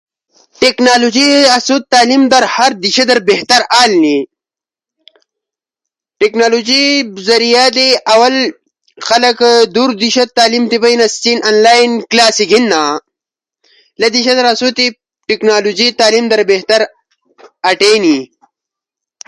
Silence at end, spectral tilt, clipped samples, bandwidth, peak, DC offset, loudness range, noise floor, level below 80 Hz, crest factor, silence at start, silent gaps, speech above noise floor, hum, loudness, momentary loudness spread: 1 s; -2 dB/octave; 0.1%; 11.5 kHz; 0 dBFS; under 0.1%; 4 LU; -89 dBFS; -58 dBFS; 12 dB; 0.6 s; none; 79 dB; none; -9 LUFS; 7 LU